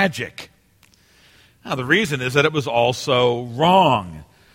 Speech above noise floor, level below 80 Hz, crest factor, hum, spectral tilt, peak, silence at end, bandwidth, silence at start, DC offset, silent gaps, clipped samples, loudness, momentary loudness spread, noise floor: 37 dB; -54 dBFS; 18 dB; none; -5 dB/octave; -2 dBFS; 0.3 s; 16.5 kHz; 0 s; under 0.1%; none; under 0.1%; -18 LUFS; 14 LU; -56 dBFS